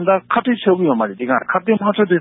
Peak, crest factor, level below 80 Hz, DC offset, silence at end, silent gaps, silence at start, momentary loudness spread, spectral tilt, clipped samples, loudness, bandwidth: -2 dBFS; 14 dB; -64 dBFS; under 0.1%; 0 s; none; 0 s; 3 LU; -11.5 dB/octave; under 0.1%; -17 LUFS; 4 kHz